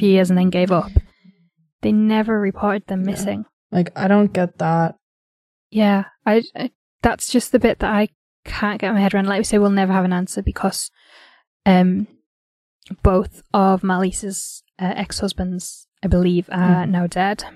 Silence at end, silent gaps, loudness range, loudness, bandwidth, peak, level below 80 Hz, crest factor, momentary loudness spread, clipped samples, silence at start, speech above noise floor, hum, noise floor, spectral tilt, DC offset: 0.05 s; 1.72-1.79 s, 3.53-3.70 s, 5.02-5.70 s, 6.75-6.99 s, 8.15-8.43 s, 11.47-11.60 s, 12.26-12.80 s, 15.88-15.92 s; 2 LU; -19 LUFS; 13.5 kHz; 0 dBFS; -34 dBFS; 18 dB; 10 LU; under 0.1%; 0 s; 36 dB; none; -53 dBFS; -6 dB/octave; under 0.1%